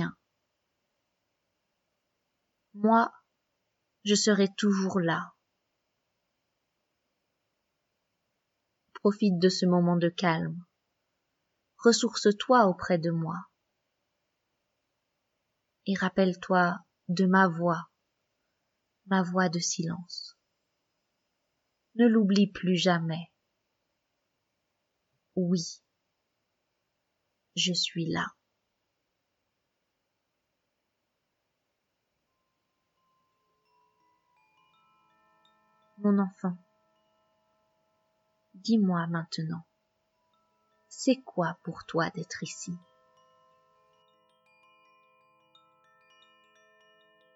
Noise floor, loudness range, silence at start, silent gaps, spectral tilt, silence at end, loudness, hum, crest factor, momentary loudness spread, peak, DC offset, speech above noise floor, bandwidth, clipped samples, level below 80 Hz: -81 dBFS; 10 LU; 0 s; none; -5 dB/octave; 4.6 s; -28 LUFS; none; 22 dB; 16 LU; -8 dBFS; under 0.1%; 55 dB; 8 kHz; under 0.1%; -76 dBFS